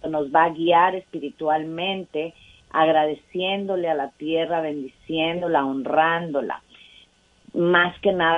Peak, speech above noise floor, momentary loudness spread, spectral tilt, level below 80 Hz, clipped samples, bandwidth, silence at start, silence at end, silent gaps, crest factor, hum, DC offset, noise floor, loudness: -2 dBFS; 34 dB; 12 LU; -7 dB/octave; -60 dBFS; under 0.1%; 8 kHz; 0.05 s; 0 s; none; 20 dB; none; under 0.1%; -56 dBFS; -22 LUFS